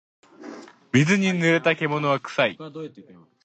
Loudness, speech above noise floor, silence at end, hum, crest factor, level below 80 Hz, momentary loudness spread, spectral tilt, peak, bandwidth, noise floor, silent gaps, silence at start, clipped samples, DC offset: -21 LUFS; 19 dB; 0.45 s; none; 18 dB; -64 dBFS; 21 LU; -5.5 dB/octave; -6 dBFS; 8.8 kHz; -42 dBFS; none; 0.4 s; under 0.1%; under 0.1%